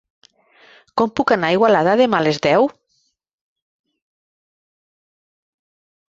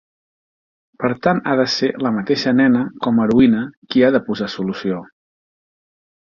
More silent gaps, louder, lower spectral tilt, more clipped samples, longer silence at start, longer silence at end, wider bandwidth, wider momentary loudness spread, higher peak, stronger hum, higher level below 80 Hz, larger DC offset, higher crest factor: second, none vs 3.77-3.82 s; about the same, -16 LUFS vs -17 LUFS; about the same, -6 dB/octave vs -6.5 dB/octave; neither; about the same, 0.95 s vs 1 s; first, 3.4 s vs 1.35 s; first, 7.8 kHz vs 7 kHz; second, 7 LU vs 10 LU; about the same, -2 dBFS vs 0 dBFS; neither; second, -60 dBFS vs -52 dBFS; neither; about the same, 20 dB vs 18 dB